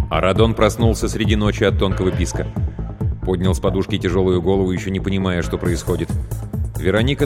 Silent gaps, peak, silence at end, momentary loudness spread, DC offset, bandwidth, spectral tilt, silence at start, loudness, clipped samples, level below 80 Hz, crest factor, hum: none; -2 dBFS; 0 s; 9 LU; under 0.1%; 16 kHz; -6 dB/octave; 0 s; -19 LUFS; under 0.1%; -28 dBFS; 16 dB; none